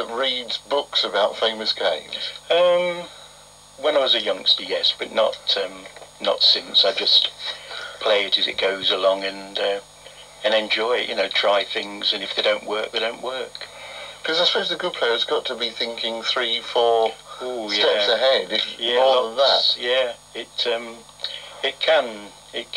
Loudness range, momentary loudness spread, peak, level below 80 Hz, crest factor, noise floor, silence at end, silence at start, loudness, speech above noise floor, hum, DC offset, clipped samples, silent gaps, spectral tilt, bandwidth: 4 LU; 14 LU; -4 dBFS; -62 dBFS; 18 dB; -47 dBFS; 0 s; 0 s; -20 LUFS; 25 dB; none; under 0.1%; under 0.1%; none; -1.5 dB/octave; 13 kHz